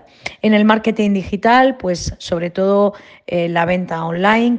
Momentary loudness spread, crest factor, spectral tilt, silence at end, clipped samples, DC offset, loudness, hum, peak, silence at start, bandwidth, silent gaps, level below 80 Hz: 10 LU; 16 dB; -6 dB/octave; 0 s; under 0.1%; under 0.1%; -16 LUFS; none; 0 dBFS; 0.25 s; 8.8 kHz; none; -42 dBFS